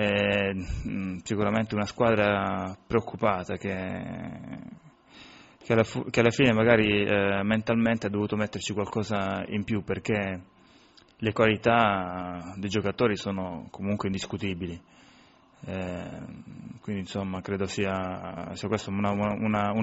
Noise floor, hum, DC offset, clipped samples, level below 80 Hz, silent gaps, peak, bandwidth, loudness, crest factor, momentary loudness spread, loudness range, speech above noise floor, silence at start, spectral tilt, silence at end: -57 dBFS; none; under 0.1%; under 0.1%; -52 dBFS; none; -6 dBFS; 8 kHz; -27 LUFS; 22 dB; 15 LU; 10 LU; 30 dB; 0 s; -5 dB/octave; 0 s